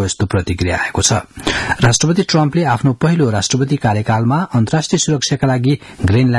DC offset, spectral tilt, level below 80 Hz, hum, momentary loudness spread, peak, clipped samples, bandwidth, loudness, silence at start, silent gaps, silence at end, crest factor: under 0.1%; -5 dB/octave; -40 dBFS; none; 4 LU; 0 dBFS; under 0.1%; 12 kHz; -15 LUFS; 0 s; none; 0 s; 14 dB